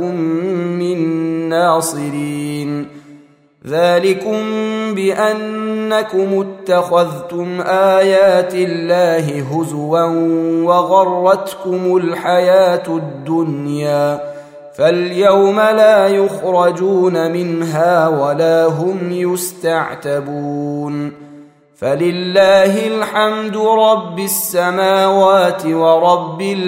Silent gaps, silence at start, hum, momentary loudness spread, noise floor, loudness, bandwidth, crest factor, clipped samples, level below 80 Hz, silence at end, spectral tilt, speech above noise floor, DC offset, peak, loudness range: none; 0 s; none; 10 LU; -45 dBFS; -14 LUFS; 16 kHz; 14 dB; under 0.1%; -64 dBFS; 0 s; -5.5 dB/octave; 31 dB; under 0.1%; 0 dBFS; 5 LU